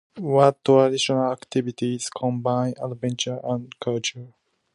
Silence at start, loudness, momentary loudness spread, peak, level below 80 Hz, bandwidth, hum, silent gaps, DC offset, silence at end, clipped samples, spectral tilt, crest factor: 0.15 s; -23 LUFS; 11 LU; -2 dBFS; -68 dBFS; 11.5 kHz; none; none; under 0.1%; 0.45 s; under 0.1%; -5 dB/octave; 22 dB